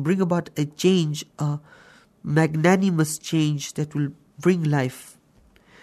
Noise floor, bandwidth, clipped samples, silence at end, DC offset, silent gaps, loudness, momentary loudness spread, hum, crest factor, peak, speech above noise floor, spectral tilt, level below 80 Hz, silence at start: -57 dBFS; 13.5 kHz; under 0.1%; 0.75 s; under 0.1%; none; -23 LUFS; 10 LU; none; 16 dB; -6 dBFS; 35 dB; -6 dB/octave; -64 dBFS; 0 s